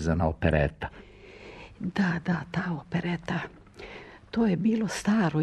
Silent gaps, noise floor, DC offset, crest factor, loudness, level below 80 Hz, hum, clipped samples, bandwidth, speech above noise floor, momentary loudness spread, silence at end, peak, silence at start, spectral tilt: none; -48 dBFS; under 0.1%; 20 dB; -28 LUFS; -44 dBFS; none; under 0.1%; 12 kHz; 21 dB; 21 LU; 0 s; -8 dBFS; 0 s; -6.5 dB/octave